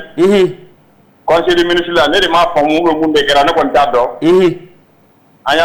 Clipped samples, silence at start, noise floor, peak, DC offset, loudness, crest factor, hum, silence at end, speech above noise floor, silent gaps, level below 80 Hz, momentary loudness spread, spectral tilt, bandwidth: under 0.1%; 0 s; -48 dBFS; -4 dBFS; under 0.1%; -11 LUFS; 8 dB; none; 0 s; 38 dB; none; -40 dBFS; 5 LU; -4.5 dB/octave; 19.5 kHz